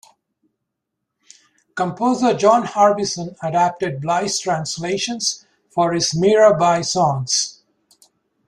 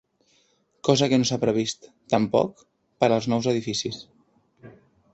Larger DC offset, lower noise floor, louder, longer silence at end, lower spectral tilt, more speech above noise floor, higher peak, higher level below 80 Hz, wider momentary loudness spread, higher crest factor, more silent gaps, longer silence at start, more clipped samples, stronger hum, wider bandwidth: neither; first, -79 dBFS vs -65 dBFS; first, -18 LUFS vs -24 LUFS; first, 0.95 s vs 0.45 s; about the same, -4 dB/octave vs -5 dB/octave; first, 61 dB vs 42 dB; about the same, -2 dBFS vs -4 dBFS; about the same, -60 dBFS vs -62 dBFS; about the same, 11 LU vs 10 LU; about the same, 18 dB vs 22 dB; neither; first, 1.75 s vs 0.85 s; neither; neither; first, 12.5 kHz vs 8.2 kHz